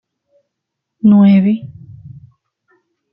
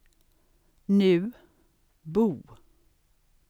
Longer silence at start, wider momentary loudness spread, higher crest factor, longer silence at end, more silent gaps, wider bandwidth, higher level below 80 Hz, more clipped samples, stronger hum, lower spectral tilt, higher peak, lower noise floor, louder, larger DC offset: first, 1.05 s vs 0.9 s; second, 15 LU vs 21 LU; about the same, 14 dB vs 18 dB; about the same, 1.05 s vs 0.95 s; neither; second, 5 kHz vs 8.6 kHz; first, -56 dBFS vs -62 dBFS; neither; neither; first, -12 dB/octave vs -8.5 dB/octave; first, -2 dBFS vs -12 dBFS; first, -77 dBFS vs -65 dBFS; first, -11 LUFS vs -25 LUFS; neither